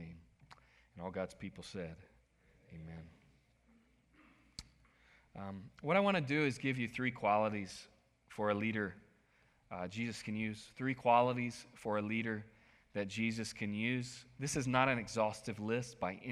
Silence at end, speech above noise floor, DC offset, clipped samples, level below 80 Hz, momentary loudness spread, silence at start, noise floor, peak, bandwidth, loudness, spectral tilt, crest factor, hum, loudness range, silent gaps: 0 s; 34 dB; under 0.1%; under 0.1%; -68 dBFS; 20 LU; 0 s; -71 dBFS; -16 dBFS; 13.5 kHz; -37 LUFS; -5.5 dB/octave; 24 dB; none; 17 LU; none